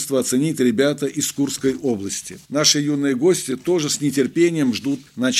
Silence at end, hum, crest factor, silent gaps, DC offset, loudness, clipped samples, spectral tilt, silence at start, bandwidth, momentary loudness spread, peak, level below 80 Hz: 0 s; none; 18 dB; none; under 0.1%; -20 LUFS; under 0.1%; -3.5 dB/octave; 0 s; 15.5 kHz; 8 LU; -2 dBFS; -62 dBFS